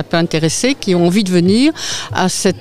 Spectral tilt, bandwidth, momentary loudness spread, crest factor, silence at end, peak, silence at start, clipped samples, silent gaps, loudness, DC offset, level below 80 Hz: -4.5 dB/octave; 15.5 kHz; 4 LU; 12 dB; 0 s; -2 dBFS; 0 s; under 0.1%; none; -14 LUFS; 2%; -46 dBFS